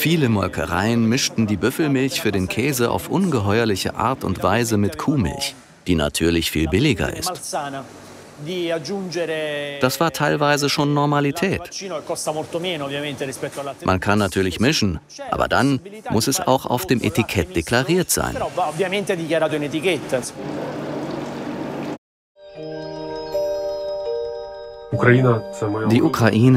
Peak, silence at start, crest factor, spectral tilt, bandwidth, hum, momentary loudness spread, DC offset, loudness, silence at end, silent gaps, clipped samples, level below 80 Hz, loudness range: -2 dBFS; 0 s; 20 dB; -5 dB/octave; 16 kHz; none; 11 LU; under 0.1%; -21 LUFS; 0 s; 21.98-22.35 s; under 0.1%; -44 dBFS; 7 LU